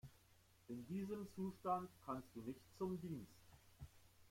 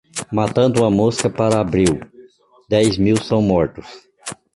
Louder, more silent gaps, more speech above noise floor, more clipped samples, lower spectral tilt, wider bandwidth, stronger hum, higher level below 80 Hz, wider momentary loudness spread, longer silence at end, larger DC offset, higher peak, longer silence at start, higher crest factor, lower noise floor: second, -49 LUFS vs -17 LUFS; neither; second, 24 dB vs 31 dB; neither; first, -7.5 dB/octave vs -6 dB/octave; first, 16.5 kHz vs 11.5 kHz; neither; second, -74 dBFS vs -42 dBFS; first, 19 LU vs 14 LU; second, 0 s vs 0.25 s; neither; second, -30 dBFS vs -2 dBFS; about the same, 0.05 s vs 0.15 s; about the same, 20 dB vs 16 dB; first, -72 dBFS vs -47 dBFS